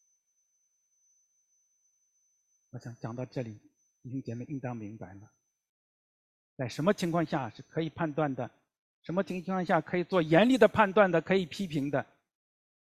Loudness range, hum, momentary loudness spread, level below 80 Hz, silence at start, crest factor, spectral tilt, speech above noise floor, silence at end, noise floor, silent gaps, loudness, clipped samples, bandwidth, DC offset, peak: 18 LU; none; 20 LU; -66 dBFS; 2.75 s; 24 dB; -6.5 dB/octave; 47 dB; 0.85 s; -76 dBFS; 5.69-6.57 s, 8.79-9.02 s; -30 LUFS; under 0.1%; 14.5 kHz; under 0.1%; -8 dBFS